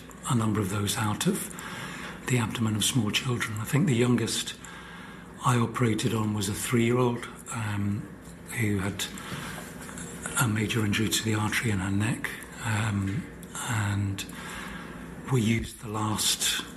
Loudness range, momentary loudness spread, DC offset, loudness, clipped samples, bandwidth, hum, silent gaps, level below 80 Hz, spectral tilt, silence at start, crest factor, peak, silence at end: 4 LU; 13 LU; under 0.1%; -28 LUFS; under 0.1%; 15 kHz; none; none; -52 dBFS; -4.5 dB/octave; 0 s; 18 dB; -12 dBFS; 0 s